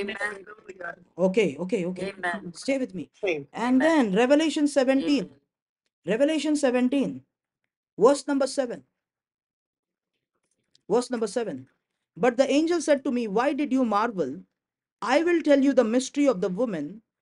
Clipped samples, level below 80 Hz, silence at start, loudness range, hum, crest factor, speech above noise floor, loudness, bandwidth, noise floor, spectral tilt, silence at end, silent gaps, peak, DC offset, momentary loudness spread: under 0.1%; -70 dBFS; 0 s; 6 LU; none; 20 dB; 60 dB; -25 LUFS; 11.5 kHz; -84 dBFS; -5 dB/octave; 0.2 s; 5.62-5.76 s, 5.93-6.02 s, 7.76-7.83 s, 7.92-7.97 s, 9.34-9.38 s, 9.46-9.73 s, 9.79-9.83 s, 14.92-14.97 s; -6 dBFS; under 0.1%; 14 LU